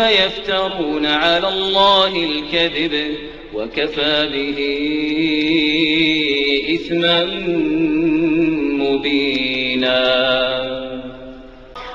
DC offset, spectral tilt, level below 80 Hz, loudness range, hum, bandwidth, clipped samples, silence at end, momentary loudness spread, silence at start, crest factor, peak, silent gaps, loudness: under 0.1%; -5 dB/octave; -42 dBFS; 2 LU; none; 7.6 kHz; under 0.1%; 0 s; 11 LU; 0 s; 18 dB; 0 dBFS; none; -16 LUFS